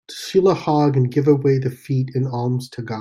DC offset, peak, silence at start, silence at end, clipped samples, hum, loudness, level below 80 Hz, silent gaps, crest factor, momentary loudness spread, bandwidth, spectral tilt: under 0.1%; -4 dBFS; 0.1 s; 0 s; under 0.1%; none; -19 LUFS; -60 dBFS; none; 14 dB; 7 LU; 13 kHz; -7.5 dB/octave